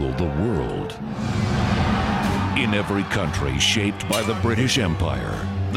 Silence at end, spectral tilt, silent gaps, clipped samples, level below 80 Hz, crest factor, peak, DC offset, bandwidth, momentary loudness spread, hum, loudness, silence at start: 0 s; -5 dB/octave; none; under 0.1%; -34 dBFS; 16 dB; -6 dBFS; under 0.1%; 16 kHz; 7 LU; none; -22 LUFS; 0 s